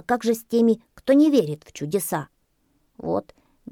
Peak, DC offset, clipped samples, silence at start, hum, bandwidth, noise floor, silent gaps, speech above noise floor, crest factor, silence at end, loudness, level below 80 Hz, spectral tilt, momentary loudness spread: -6 dBFS; under 0.1%; under 0.1%; 0.1 s; none; 18.5 kHz; -67 dBFS; none; 46 dB; 16 dB; 0.5 s; -22 LUFS; -62 dBFS; -5.5 dB/octave; 14 LU